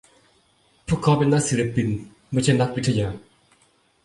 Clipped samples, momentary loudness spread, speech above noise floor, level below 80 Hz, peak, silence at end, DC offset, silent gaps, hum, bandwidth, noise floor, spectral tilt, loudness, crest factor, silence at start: under 0.1%; 12 LU; 41 dB; -48 dBFS; -6 dBFS; 0.85 s; under 0.1%; none; none; 11.5 kHz; -62 dBFS; -6 dB/octave; -22 LUFS; 18 dB; 0.9 s